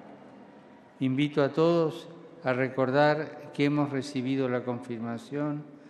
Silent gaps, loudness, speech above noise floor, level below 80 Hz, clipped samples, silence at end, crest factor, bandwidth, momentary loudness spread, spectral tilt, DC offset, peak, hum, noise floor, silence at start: none; -28 LUFS; 25 dB; -76 dBFS; under 0.1%; 0 s; 18 dB; 11 kHz; 11 LU; -7 dB/octave; under 0.1%; -10 dBFS; none; -53 dBFS; 0.05 s